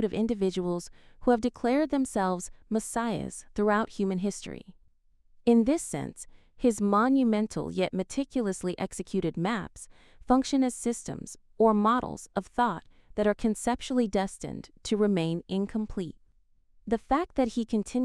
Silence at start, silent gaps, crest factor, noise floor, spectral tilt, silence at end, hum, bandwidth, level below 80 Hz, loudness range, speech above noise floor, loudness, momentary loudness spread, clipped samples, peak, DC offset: 0 s; none; 18 dB; -63 dBFS; -5.5 dB/octave; 0 s; none; 14 kHz; -52 dBFS; 3 LU; 35 dB; -28 LUFS; 15 LU; under 0.1%; -10 dBFS; under 0.1%